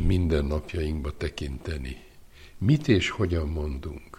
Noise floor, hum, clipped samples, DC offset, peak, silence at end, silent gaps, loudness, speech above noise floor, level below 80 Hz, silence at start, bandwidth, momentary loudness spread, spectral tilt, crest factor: -49 dBFS; none; under 0.1%; under 0.1%; -8 dBFS; 0.05 s; none; -28 LUFS; 22 dB; -34 dBFS; 0 s; 12.5 kHz; 12 LU; -7 dB/octave; 18 dB